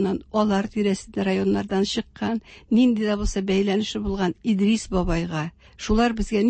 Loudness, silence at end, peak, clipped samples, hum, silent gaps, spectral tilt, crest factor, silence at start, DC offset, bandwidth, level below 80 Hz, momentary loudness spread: -23 LUFS; 0 s; -8 dBFS; under 0.1%; none; none; -6 dB/octave; 14 dB; 0 s; under 0.1%; 8.8 kHz; -36 dBFS; 8 LU